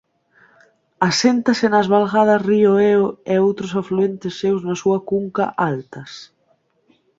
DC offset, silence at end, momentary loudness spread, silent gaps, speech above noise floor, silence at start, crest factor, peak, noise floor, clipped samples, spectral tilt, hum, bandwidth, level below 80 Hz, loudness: under 0.1%; 0.95 s; 9 LU; none; 45 dB; 1 s; 16 dB; -2 dBFS; -63 dBFS; under 0.1%; -5.5 dB/octave; none; 7.8 kHz; -60 dBFS; -18 LUFS